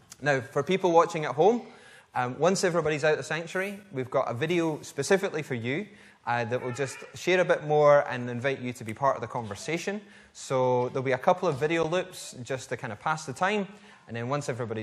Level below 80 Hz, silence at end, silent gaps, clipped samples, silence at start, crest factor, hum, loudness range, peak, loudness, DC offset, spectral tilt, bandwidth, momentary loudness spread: -68 dBFS; 0 s; none; under 0.1%; 0.2 s; 22 dB; none; 4 LU; -6 dBFS; -28 LUFS; under 0.1%; -5 dB/octave; 14 kHz; 12 LU